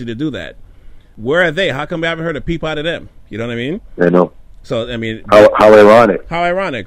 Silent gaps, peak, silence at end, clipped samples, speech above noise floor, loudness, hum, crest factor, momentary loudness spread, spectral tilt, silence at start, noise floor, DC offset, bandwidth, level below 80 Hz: none; 0 dBFS; 0 s; 0.8%; 24 dB; -12 LUFS; none; 12 dB; 17 LU; -6 dB/octave; 0 s; -36 dBFS; under 0.1%; 12.5 kHz; -38 dBFS